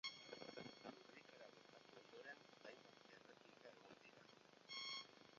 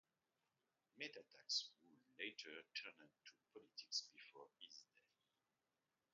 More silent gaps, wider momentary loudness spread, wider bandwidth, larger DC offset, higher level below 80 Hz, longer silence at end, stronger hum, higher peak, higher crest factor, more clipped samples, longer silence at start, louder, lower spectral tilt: neither; second, 14 LU vs 20 LU; about the same, 7.2 kHz vs 7.2 kHz; neither; about the same, under -90 dBFS vs under -90 dBFS; second, 0 s vs 1.3 s; neither; second, -36 dBFS vs -30 dBFS; about the same, 24 dB vs 26 dB; neither; second, 0.05 s vs 0.95 s; second, -59 LUFS vs -51 LUFS; first, -0.5 dB/octave vs 2 dB/octave